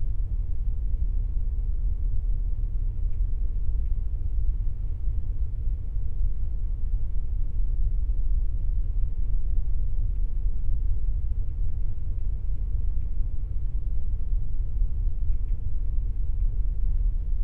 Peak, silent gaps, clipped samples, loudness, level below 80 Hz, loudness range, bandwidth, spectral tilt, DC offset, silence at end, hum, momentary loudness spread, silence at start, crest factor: -12 dBFS; none; under 0.1%; -32 LUFS; -26 dBFS; 1 LU; 0.9 kHz; -11 dB/octave; under 0.1%; 0 s; none; 3 LU; 0 s; 10 dB